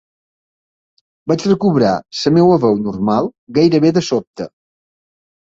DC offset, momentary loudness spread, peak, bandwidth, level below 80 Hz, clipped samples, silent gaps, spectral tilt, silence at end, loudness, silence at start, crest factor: under 0.1%; 13 LU; -2 dBFS; 7.8 kHz; -52 dBFS; under 0.1%; 3.38-3.47 s, 4.27-4.34 s; -7 dB/octave; 1 s; -15 LUFS; 1.25 s; 16 dB